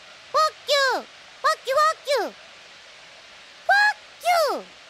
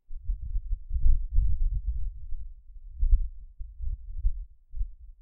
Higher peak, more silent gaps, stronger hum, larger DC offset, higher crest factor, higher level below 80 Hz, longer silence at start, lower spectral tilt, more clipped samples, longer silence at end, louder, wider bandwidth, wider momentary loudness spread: about the same, -8 dBFS vs -10 dBFS; neither; neither; neither; about the same, 16 dB vs 18 dB; second, -72 dBFS vs -28 dBFS; first, 0.35 s vs 0.1 s; second, 0 dB/octave vs -12.5 dB/octave; neither; first, 0.25 s vs 0.1 s; first, -22 LUFS vs -34 LUFS; first, 16 kHz vs 0.2 kHz; second, 11 LU vs 18 LU